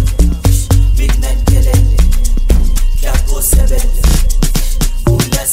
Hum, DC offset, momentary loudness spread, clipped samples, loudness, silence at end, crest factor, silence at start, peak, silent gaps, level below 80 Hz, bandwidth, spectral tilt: none; under 0.1%; 5 LU; under 0.1%; -13 LUFS; 0 s; 8 dB; 0 s; 0 dBFS; none; -10 dBFS; 16.5 kHz; -5 dB/octave